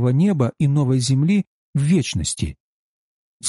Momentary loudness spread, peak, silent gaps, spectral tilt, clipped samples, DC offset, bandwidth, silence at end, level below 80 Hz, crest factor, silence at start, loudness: 8 LU; -8 dBFS; 1.47-1.73 s, 2.60-3.40 s; -6 dB/octave; under 0.1%; under 0.1%; 11.5 kHz; 0 s; -42 dBFS; 12 dB; 0 s; -20 LUFS